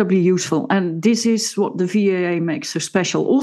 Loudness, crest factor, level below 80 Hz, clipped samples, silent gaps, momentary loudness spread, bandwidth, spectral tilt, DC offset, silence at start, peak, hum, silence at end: -19 LUFS; 14 dB; -72 dBFS; under 0.1%; none; 5 LU; 12.5 kHz; -5 dB/octave; under 0.1%; 0 s; -2 dBFS; none; 0 s